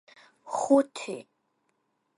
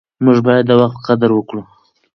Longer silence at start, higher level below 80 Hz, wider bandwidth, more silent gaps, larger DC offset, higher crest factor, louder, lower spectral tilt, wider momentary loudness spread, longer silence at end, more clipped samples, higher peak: first, 0.45 s vs 0.2 s; second, -78 dBFS vs -56 dBFS; first, 11.5 kHz vs 6.2 kHz; neither; neither; first, 22 dB vs 14 dB; second, -27 LUFS vs -13 LUFS; second, -4 dB/octave vs -8.5 dB/octave; first, 15 LU vs 12 LU; first, 0.95 s vs 0.5 s; neither; second, -8 dBFS vs 0 dBFS